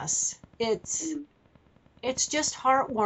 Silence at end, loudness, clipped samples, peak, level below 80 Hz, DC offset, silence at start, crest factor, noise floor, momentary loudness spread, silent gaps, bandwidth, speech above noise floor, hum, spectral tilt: 0 s; -28 LUFS; under 0.1%; -12 dBFS; -62 dBFS; under 0.1%; 0 s; 18 dB; -60 dBFS; 10 LU; none; 8.2 kHz; 33 dB; none; -2 dB/octave